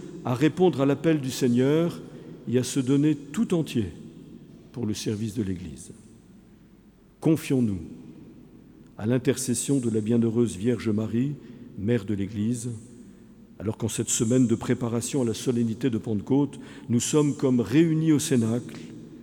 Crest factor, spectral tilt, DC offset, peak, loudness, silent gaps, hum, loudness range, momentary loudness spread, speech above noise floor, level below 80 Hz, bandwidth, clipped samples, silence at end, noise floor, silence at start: 18 dB; -6 dB/octave; under 0.1%; -8 dBFS; -25 LUFS; none; none; 7 LU; 18 LU; 30 dB; -58 dBFS; 19 kHz; under 0.1%; 0 s; -54 dBFS; 0 s